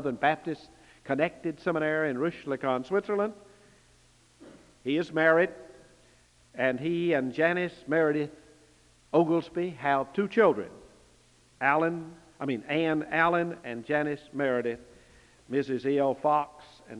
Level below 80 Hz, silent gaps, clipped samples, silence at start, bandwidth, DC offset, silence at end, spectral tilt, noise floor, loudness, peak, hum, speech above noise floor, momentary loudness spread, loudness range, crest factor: -66 dBFS; none; under 0.1%; 0 s; 11 kHz; under 0.1%; 0 s; -7 dB/octave; -61 dBFS; -28 LUFS; -10 dBFS; none; 33 dB; 13 LU; 3 LU; 20 dB